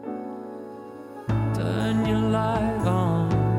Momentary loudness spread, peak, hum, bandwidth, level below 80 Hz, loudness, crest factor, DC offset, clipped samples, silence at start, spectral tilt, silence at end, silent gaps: 16 LU; -10 dBFS; none; 11.5 kHz; -42 dBFS; -24 LUFS; 14 dB; under 0.1%; under 0.1%; 0 s; -8 dB/octave; 0 s; none